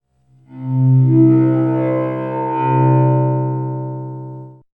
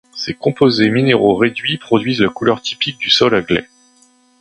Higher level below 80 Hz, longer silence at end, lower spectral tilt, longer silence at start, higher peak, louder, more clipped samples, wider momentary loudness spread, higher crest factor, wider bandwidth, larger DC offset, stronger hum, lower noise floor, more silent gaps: second, -66 dBFS vs -50 dBFS; second, 0.2 s vs 0.75 s; first, -13 dB/octave vs -5.5 dB/octave; first, 0.5 s vs 0.15 s; about the same, -2 dBFS vs 0 dBFS; about the same, -15 LUFS vs -15 LUFS; neither; first, 18 LU vs 7 LU; about the same, 14 dB vs 16 dB; second, 3.2 kHz vs 11 kHz; neither; neither; about the same, -52 dBFS vs -52 dBFS; neither